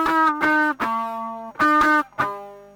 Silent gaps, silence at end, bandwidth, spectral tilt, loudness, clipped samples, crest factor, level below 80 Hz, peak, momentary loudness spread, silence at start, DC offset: none; 0.1 s; over 20 kHz; -4.5 dB/octave; -20 LUFS; under 0.1%; 14 dB; -54 dBFS; -8 dBFS; 13 LU; 0 s; under 0.1%